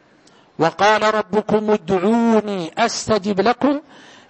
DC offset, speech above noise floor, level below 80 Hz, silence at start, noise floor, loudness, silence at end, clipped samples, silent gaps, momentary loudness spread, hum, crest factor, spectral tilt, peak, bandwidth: under 0.1%; 34 dB; -54 dBFS; 0.6 s; -51 dBFS; -18 LUFS; 0.5 s; under 0.1%; none; 6 LU; none; 16 dB; -5 dB/octave; -4 dBFS; 8.6 kHz